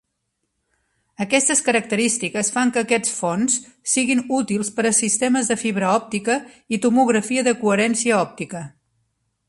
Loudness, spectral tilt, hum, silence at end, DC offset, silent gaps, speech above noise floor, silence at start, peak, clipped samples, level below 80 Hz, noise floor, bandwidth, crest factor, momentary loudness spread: -19 LUFS; -3 dB/octave; none; 0.8 s; under 0.1%; none; 55 dB; 1.2 s; -2 dBFS; under 0.1%; -64 dBFS; -75 dBFS; 11.5 kHz; 18 dB; 7 LU